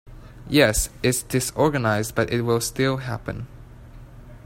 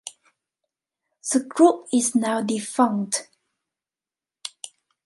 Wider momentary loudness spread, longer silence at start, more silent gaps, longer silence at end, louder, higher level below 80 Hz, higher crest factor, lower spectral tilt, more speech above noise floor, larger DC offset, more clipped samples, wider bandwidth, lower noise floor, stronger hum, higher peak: second, 12 LU vs 20 LU; about the same, 0.05 s vs 0.05 s; neither; second, 0 s vs 0.4 s; about the same, -22 LUFS vs -22 LUFS; first, -40 dBFS vs -76 dBFS; about the same, 20 dB vs 22 dB; about the same, -4.5 dB/octave vs -4 dB/octave; second, 21 dB vs over 69 dB; neither; neither; first, 16.5 kHz vs 11.5 kHz; second, -43 dBFS vs under -90 dBFS; neither; about the same, -2 dBFS vs -4 dBFS